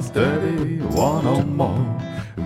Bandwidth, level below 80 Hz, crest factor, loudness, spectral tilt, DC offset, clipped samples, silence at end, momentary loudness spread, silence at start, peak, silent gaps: 15.5 kHz; -42 dBFS; 16 dB; -21 LUFS; -7 dB/octave; under 0.1%; under 0.1%; 0 s; 6 LU; 0 s; -6 dBFS; none